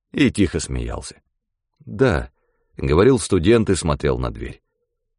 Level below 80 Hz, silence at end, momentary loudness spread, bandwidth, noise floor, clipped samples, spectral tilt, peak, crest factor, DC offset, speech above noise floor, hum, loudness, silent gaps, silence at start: -34 dBFS; 0.65 s; 19 LU; 11 kHz; -76 dBFS; under 0.1%; -6 dB/octave; -4 dBFS; 16 dB; under 0.1%; 57 dB; none; -19 LUFS; none; 0.15 s